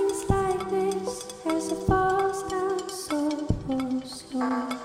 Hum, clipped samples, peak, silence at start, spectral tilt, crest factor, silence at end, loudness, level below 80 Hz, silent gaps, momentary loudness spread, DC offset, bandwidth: none; under 0.1%; -8 dBFS; 0 s; -5.5 dB/octave; 20 dB; 0 s; -28 LUFS; -42 dBFS; none; 7 LU; under 0.1%; 15.5 kHz